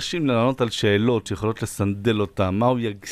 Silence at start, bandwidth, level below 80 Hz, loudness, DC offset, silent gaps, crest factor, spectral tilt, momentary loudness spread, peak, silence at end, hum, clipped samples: 0 s; 15.5 kHz; -50 dBFS; -22 LUFS; under 0.1%; none; 16 dB; -6 dB/octave; 6 LU; -6 dBFS; 0 s; none; under 0.1%